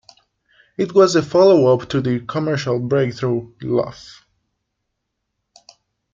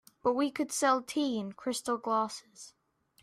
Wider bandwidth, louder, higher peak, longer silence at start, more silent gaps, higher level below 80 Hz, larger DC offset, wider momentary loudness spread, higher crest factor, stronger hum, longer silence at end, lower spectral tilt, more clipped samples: second, 7.6 kHz vs 15.5 kHz; first, -17 LUFS vs -31 LUFS; first, -2 dBFS vs -14 dBFS; first, 0.8 s vs 0.25 s; neither; first, -56 dBFS vs -74 dBFS; neither; second, 11 LU vs 19 LU; about the same, 18 dB vs 18 dB; neither; first, 2.05 s vs 0.55 s; first, -6.5 dB/octave vs -3 dB/octave; neither